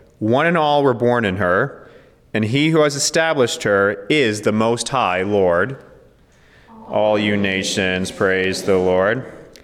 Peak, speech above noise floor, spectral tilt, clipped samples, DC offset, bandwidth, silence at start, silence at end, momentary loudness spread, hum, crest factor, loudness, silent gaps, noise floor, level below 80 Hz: -6 dBFS; 34 dB; -4.5 dB/octave; under 0.1%; under 0.1%; 15 kHz; 0.2 s; 0.2 s; 5 LU; none; 12 dB; -17 LUFS; none; -51 dBFS; -56 dBFS